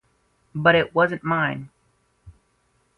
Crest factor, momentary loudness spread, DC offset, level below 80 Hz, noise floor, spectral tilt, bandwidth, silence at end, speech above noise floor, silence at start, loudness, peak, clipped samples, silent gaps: 22 dB; 15 LU; under 0.1%; -56 dBFS; -66 dBFS; -7.5 dB/octave; 5.8 kHz; 0.65 s; 46 dB; 0.55 s; -21 LUFS; -2 dBFS; under 0.1%; none